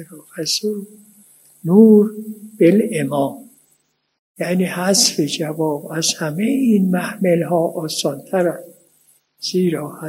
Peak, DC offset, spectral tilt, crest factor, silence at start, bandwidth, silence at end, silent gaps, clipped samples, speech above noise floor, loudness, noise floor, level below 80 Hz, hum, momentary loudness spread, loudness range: 0 dBFS; under 0.1%; -4.5 dB/octave; 18 dB; 0 s; 16 kHz; 0 s; 4.19-4.35 s; under 0.1%; 46 dB; -17 LUFS; -63 dBFS; -70 dBFS; none; 13 LU; 3 LU